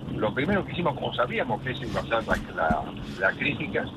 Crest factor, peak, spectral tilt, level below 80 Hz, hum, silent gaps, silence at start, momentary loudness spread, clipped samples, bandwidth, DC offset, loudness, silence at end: 20 dB; -8 dBFS; -6.5 dB/octave; -46 dBFS; none; none; 0 s; 5 LU; under 0.1%; 13 kHz; under 0.1%; -27 LUFS; 0 s